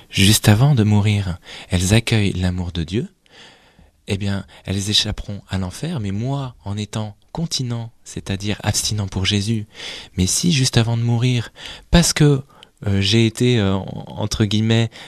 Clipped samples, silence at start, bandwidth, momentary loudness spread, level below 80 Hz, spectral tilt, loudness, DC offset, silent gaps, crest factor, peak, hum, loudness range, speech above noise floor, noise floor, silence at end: under 0.1%; 0.1 s; 14.5 kHz; 14 LU; -36 dBFS; -4.5 dB/octave; -19 LUFS; under 0.1%; none; 20 dB; 0 dBFS; none; 6 LU; 33 dB; -52 dBFS; 0 s